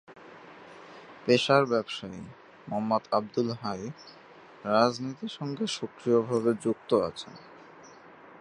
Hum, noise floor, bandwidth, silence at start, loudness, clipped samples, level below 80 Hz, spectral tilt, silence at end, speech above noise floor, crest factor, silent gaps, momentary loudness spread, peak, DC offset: none; -51 dBFS; 11 kHz; 0.1 s; -28 LUFS; under 0.1%; -68 dBFS; -5.5 dB/octave; 0.05 s; 23 dB; 22 dB; none; 24 LU; -6 dBFS; under 0.1%